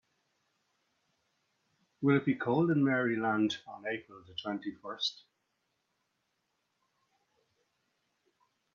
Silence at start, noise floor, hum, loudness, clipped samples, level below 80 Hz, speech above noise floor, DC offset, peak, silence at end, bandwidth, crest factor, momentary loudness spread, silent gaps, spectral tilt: 2 s; -81 dBFS; none; -32 LUFS; under 0.1%; -78 dBFS; 49 dB; under 0.1%; -16 dBFS; 3.6 s; 7.2 kHz; 20 dB; 12 LU; none; -6.5 dB/octave